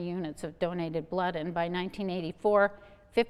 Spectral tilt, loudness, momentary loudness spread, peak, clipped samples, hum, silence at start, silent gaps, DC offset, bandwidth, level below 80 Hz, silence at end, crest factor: -6.5 dB/octave; -31 LUFS; 9 LU; -12 dBFS; under 0.1%; none; 0 s; none; under 0.1%; 13 kHz; -60 dBFS; 0 s; 18 dB